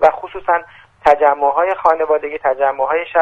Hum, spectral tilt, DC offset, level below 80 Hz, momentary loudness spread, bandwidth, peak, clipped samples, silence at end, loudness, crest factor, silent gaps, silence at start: none; -5 dB/octave; under 0.1%; -48 dBFS; 6 LU; 7.8 kHz; 0 dBFS; under 0.1%; 0 s; -16 LUFS; 16 dB; none; 0 s